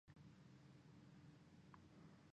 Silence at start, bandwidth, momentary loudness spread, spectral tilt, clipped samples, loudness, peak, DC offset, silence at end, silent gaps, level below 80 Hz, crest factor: 0.05 s; 8.4 kHz; 1 LU; -6.5 dB/octave; under 0.1%; -66 LUFS; -46 dBFS; under 0.1%; 0 s; none; -82 dBFS; 18 dB